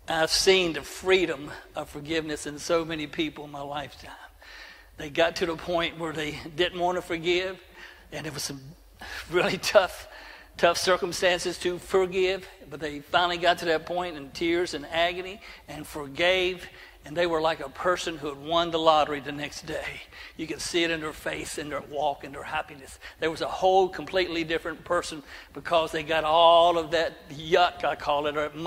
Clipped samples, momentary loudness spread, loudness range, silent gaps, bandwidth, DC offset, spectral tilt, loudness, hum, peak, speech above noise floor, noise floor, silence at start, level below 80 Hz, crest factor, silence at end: under 0.1%; 18 LU; 7 LU; none; 16 kHz; under 0.1%; -3.5 dB/octave; -26 LUFS; none; -6 dBFS; 20 dB; -47 dBFS; 0.1 s; -54 dBFS; 22 dB; 0 s